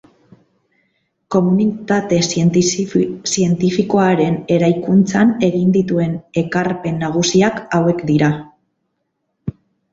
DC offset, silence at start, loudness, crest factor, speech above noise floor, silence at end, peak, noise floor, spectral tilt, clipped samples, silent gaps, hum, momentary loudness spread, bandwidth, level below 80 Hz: under 0.1%; 1.3 s; -16 LUFS; 14 dB; 56 dB; 0.4 s; -2 dBFS; -71 dBFS; -5.5 dB/octave; under 0.1%; none; none; 6 LU; 8 kHz; -52 dBFS